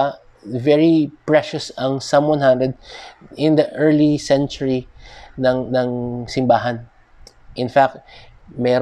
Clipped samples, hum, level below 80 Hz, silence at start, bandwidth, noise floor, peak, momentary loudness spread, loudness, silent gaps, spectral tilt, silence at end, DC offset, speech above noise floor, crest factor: under 0.1%; none; -48 dBFS; 0 s; 10 kHz; -46 dBFS; -2 dBFS; 18 LU; -18 LUFS; none; -6.5 dB/octave; 0 s; under 0.1%; 28 dB; 16 dB